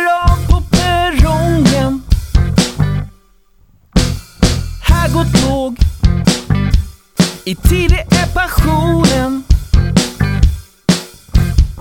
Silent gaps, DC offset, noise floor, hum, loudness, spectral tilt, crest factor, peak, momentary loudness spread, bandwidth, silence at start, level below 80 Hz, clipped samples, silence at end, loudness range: none; 0.2%; -48 dBFS; none; -14 LUFS; -5.5 dB/octave; 12 dB; 0 dBFS; 5 LU; 17.5 kHz; 0 s; -16 dBFS; under 0.1%; 0 s; 2 LU